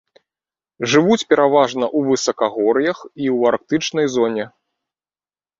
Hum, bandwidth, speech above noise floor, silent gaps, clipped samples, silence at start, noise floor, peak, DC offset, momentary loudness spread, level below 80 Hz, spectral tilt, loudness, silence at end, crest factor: none; 7.8 kHz; over 73 dB; none; under 0.1%; 0.8 s; under -90 dBFS; -2 dBFS; under 0.1%; 8 LU; -62 dBFS; -4.5 dB/octave; -17 LUFS; 1.1 s; 18 dB